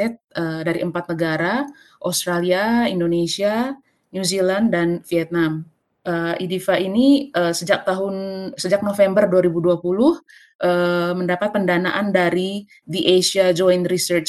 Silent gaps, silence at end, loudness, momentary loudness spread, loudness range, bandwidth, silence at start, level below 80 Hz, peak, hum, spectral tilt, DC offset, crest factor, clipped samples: 0.24-0.28 s, 10.55-10.59 s; 0 s; -19 LUFS; 10 LU; 3 LU; 12.5 kHz; 0 s; -58 dBFS; -2 dBFS; none; -5 dB/octave; under 0.1%; 16 dB; under 0.1%